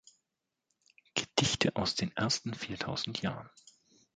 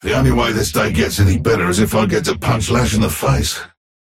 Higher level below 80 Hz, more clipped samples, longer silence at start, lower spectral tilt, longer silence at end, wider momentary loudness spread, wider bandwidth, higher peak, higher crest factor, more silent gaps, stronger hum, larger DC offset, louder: second, -62 dBFS vs -28 dBFS; neither; first, 1.15 s vs 0.05 s; second, -3.5 dB/octave vs -5 dB/octave; first, 0.7 s vs 0.35 s; first, 9 LU vs 3 LU; second, 9.4 kHz vs 16.5 kHz; second, -8 dBFS vs -4 dBFS; first, 28 dB vs 12 dB; neither; neither; neither; second, -33 LUFS vs -16 LUFS